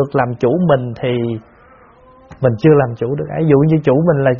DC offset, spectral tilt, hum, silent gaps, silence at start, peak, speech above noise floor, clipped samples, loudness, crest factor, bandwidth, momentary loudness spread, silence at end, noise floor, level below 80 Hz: under 0.1%; -8 dB/octave; none; none; 0 s; 0 dBFS; 31 dB; under 0.1%; -15 LUFS; 14 dB; 6.2 kHz; 8 LU; 0 s; -45 dBFS; -46 dBFS